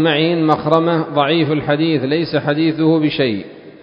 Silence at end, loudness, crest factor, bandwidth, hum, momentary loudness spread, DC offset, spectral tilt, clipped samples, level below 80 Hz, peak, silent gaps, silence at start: 0.1 s; -16 LUFS; 16 dB; 5.4 kHz; none; 4 LU; under 0.1%; -8.5 dB/octave; under 0.1%; -54 dBFS; 0 dBFS; none; 0 s